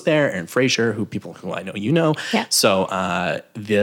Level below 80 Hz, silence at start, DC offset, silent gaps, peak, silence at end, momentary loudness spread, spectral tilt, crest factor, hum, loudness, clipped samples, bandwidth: -64 dBFS; 0 s; under 0.1%; none; -4 dBFS; 0 s; 12 LU; -4 dB/octave; 16 dB; none; -20 LUFS; under 0.1%; 18 kHz